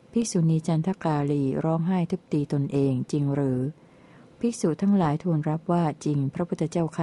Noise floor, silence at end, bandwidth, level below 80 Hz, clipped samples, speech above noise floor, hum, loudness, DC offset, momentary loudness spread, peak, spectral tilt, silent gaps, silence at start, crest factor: -52 dBFS; 0 s; 11.5 kHz; -60 dBFS; under 0.1%; 27 dB; none; -26 LUFS; under 0.1%; 5 LU; -12 dBFS; -7.5 dB/octave; none; 0.15 s; 14 dB